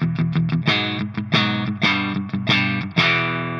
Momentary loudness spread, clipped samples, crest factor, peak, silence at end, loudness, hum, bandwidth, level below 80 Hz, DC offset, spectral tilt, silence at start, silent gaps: 6 LU; under 0.1%; 18 dB; -4 dBFS; 0 s; -19 LUFS; none; 7.2 kHz; -56 dBFS; under 0.1%; -6 dB/octave; 0 s; none